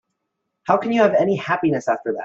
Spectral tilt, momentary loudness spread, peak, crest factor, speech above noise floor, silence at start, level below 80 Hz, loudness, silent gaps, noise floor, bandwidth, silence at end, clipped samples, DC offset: -6.5 dB/octave; 6 LU; -2 dBFS; 18 dB; 58 dB; 0.65 s; -64 dBFS; -19 LUFS; none; -77 dBFS; 7.8 kHz; 0 s; under 0.1%; under 0.1%